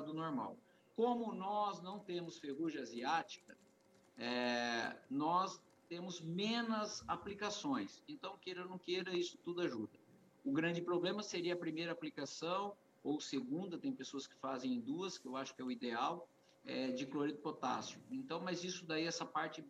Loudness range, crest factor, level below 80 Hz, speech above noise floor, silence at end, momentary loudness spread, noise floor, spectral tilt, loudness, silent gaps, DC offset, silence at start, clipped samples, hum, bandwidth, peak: 3 LU; 18 dB; -82 dBFS; 28 dB; 0 s; 10 LU; -70 dBFS; -4.5 dB/octave; -42 LUFS; none; under 0.1%; 0 s; under 0.1%; none; 10.5 kHz; -24 dBFS